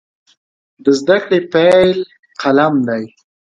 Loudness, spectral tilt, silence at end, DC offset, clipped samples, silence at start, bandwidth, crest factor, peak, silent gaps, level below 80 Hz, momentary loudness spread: -14 LUFS; -6 dB/octave; 0.35 s; under 0.1%; under 0.1%; 0.85 s; 11 kHz; 14 dB; 0 dBFS; 2.19-2.23 s; -56 dBFS; 12 LU